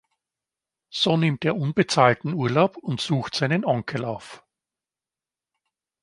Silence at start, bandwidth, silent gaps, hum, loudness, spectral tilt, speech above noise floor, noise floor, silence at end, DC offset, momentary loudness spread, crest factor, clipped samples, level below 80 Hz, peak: 0.95 s; 11.5 kHz; none; none; -23 LUFS; -5.5 dB/octave; over 67 dB; under -90 dBFS; 1.65 s; under 0.1%; 11 LU; 22 dB; under 0.1%; -64 dBFS; -2 dBFS